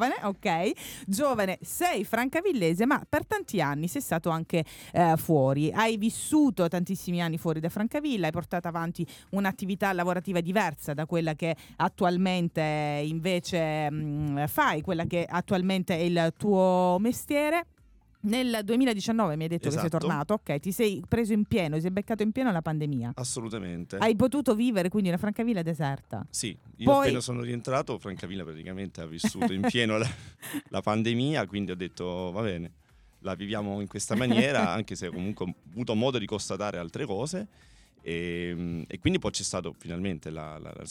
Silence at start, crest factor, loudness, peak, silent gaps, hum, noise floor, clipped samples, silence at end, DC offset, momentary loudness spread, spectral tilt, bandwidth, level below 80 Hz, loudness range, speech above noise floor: 0 s; 18 dB; -29 LUFS; -10 dBFS; none; none; -60 dBFS; under 0.1%; 0 s; under 0.1%; 11 LU; -5.5 dB/octave; 18 kHz; -58 dBFS; 5 LU; 32 dB